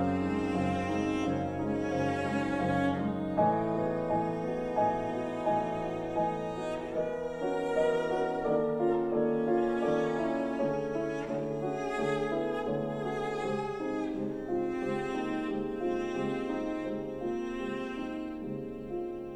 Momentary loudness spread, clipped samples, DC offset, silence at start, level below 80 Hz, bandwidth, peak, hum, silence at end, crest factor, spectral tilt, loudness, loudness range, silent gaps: 7 LU; under 0.1%; under 0.1%; 0 s; -56 dBFS; 10.5 kHz; -16 dBFS; none; 0 s; 16 dB; -7 dB/octave; -32 LUFS; 4 LU; none